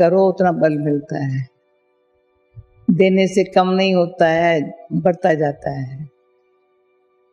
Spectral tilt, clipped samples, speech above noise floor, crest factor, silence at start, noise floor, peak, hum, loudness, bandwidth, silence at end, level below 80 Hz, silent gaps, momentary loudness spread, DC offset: -7 dB/octave; under 0.1%; 46 dB; 16 dB; 0 s; -62 dBFS; -2 dBFS; none; -17 LUFS; 10.5 kHz; 1.25 s; -56 dBFS; none; 13 LU; under 0.1%